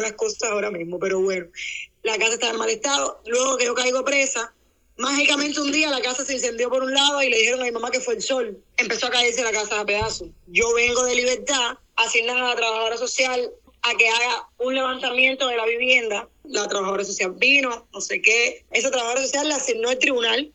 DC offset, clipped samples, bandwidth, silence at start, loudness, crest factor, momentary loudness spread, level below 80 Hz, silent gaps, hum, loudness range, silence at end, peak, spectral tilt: under 0.1%; under 0.1%; 8.6 kHz; 0 s; -21 LUFS; 20 dB; 9 LU; -54 dBFS; none; none; 2 LU; 0.05 s; -2 dBFS; -1 dB/octave